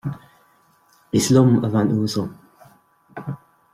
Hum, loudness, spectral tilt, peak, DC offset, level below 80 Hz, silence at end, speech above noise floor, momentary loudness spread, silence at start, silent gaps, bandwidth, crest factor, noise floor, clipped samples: none; -19 LUFS; -6 dB/octave; -4 dBFS; under 0.1%; -56 dBFS; 0.35 s; 40 dB; 22 LU; 0.05 s; none; 15 kHz; 18 dB; -58 dBFS; under 0.1%